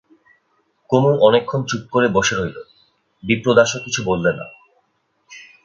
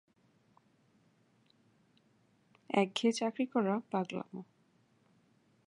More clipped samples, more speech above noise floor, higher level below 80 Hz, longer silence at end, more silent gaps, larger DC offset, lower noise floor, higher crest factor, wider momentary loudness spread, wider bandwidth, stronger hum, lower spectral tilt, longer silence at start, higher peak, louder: neither; first, 49 dB vs 37 dB; first, -50 dBFS vs -88 dBFS; second, 0.2 s vs 1.25 s; neither; neither; second, -66 dBFS vs -71 dBFS; about the same, 20 dB vs 24 dB; first, 15 LU vs 12 LU; second, 7.8 kHz vs 11 kHz; neither; about the same, -4.5 dB/octave vs -5 dB/octave; second, 0.9 s vs 2.7 s; first, 0 dBFS vs -14 dBFS; first, -17 LUFS vs -34 LUFS